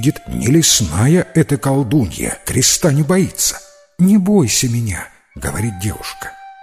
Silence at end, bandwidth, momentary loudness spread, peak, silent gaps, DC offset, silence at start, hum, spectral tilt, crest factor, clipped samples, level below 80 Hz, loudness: 0 s; 16 kHz; 15 LU; 0 dBFS; none; under 0.1%; 0 s; none; -4.5 dB/octave; 16 dB; under 0.1%; -36 dBFS; -15 LUFS